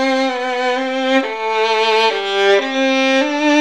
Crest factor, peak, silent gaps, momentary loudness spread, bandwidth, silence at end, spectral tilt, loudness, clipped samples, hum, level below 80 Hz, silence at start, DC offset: 12 dB; -4 dBFS; none; 4 LU; 12 kHz; 0 s; -2 dB/octave; -15 LUFS; under 0.1%; none; -68 dBFS; 0 s; 0.4%